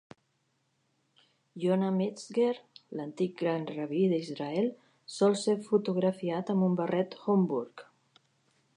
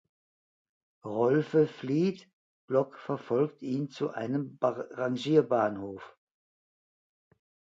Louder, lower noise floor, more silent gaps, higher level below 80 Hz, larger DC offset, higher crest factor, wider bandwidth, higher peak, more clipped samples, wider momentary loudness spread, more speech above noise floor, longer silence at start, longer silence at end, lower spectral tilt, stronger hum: about the same, -30 LUFS vs -30 LUFS; second, -76 dBFS vs under -90 dBFS; second, none vs 2.33-2.68 s; second, -84 dBFS vs -76 dBFS; neither; about the same, 18 dB vs 20 dB; first, 10.5 kHz vs 7.6 kHz; second, -14 dBFS vs -10 dBFS; neither; about the same, 11 LU vs 12 LU; second, 46 dB vs over 61 dB; first, 1.55 s vs 1.05 s; second, 0.95 s vs 1.65 s; about the same, -7 dB/octave vs -8 dB/octave; neither